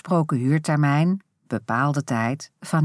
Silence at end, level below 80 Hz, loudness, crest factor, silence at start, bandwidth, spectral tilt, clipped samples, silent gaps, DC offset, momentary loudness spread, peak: 0 s; -72 dBFS; -23 LUFS; 14 dB; 0.05 s; 11 kHz; -7 dB/octave; under 0.1%; none; under 0.1%; 11 LU; -8 dBFS